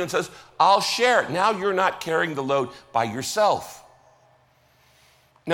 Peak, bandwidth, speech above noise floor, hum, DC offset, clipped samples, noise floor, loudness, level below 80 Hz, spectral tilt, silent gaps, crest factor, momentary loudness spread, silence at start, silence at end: -6 dBFS; 17 kHz; 38 dB; none; under 0.1%; under 0.1%; -60 dBFS; -22 LUFS; -64 dBFS; -3.5 dB/octave; none; 18 dB; 9 LU; 0 s; 0 s